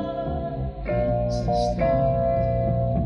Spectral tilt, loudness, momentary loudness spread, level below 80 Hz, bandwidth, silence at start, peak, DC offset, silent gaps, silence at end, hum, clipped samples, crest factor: -8.5 dB/octave; -24 LUFS; 7 LU; -32 dBFS; 10 kHz; 0 s; -10 dBFS; under 0.1%; none; 0 s; none; under 0.1%; 12 dB